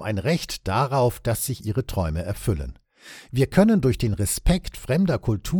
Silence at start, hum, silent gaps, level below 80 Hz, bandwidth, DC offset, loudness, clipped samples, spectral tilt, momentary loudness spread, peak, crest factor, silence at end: 0 s; none; none; -34 dBFS; 17.5 kHz; under 0.1%; -23 LUFS; under 0.1%; -6 dB/octave; 9 LU; -4 dBFS; 20 dB; 0 s